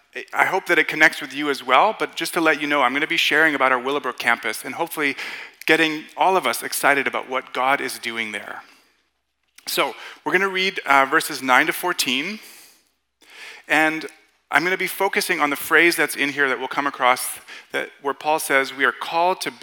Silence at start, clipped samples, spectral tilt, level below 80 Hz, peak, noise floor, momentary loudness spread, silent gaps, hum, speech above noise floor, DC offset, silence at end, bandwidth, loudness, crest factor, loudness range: 0.15 s; under 0.1%; -2 dB/octave; -76 dBFS; -2 dBFS; -72 dBFS; 12 LU; none; none; 51 dB; under 0.1%; 0.05 s; 18 kHz; -20 LUFS; 20 dB; 5 LU